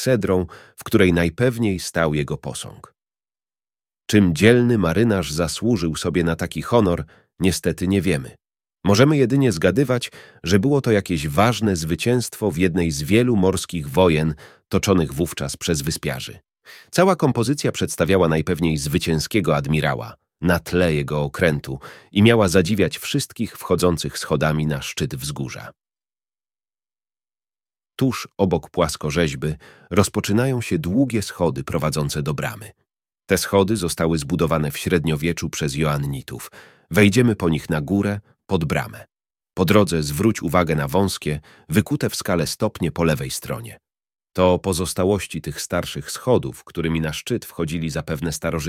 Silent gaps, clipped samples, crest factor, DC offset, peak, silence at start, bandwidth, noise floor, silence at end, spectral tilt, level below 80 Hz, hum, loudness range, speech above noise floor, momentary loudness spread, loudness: none; under 0.1%; 20 dB; under 0.1%; 0 dBFS; 0 s; 16.5 kHz; under -90 dBFS; 0 s; -5.5 dB/octave; -42 dBFS; none; 4 LU; over 70 dB; 11 LU; -21 LUFS